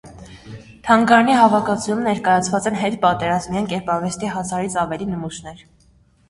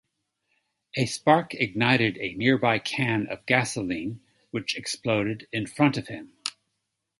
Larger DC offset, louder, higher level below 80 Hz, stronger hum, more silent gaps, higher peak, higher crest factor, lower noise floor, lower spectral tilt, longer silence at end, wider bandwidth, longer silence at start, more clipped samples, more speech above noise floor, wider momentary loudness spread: neither; first, -18 LUFS vs -25 LUFS; first, -50 dBFS vs -62 dBFS; neither; neither; first, 0 dBFS vs -4 dBFS; second, 18 dB vs 24 dB; second, -55 dBFS vs -80 dBFS; about the same, -5 dB/octave vs -5 dB/octave; about the same, 0.7 s vs 0.7 s; about the same, 11.5 kHz vs 11.5 kHz; second, 0.05 s vs 0.95 s; neither; second, 37 dB vs 55 dB; first, 18 LU vs 13 LU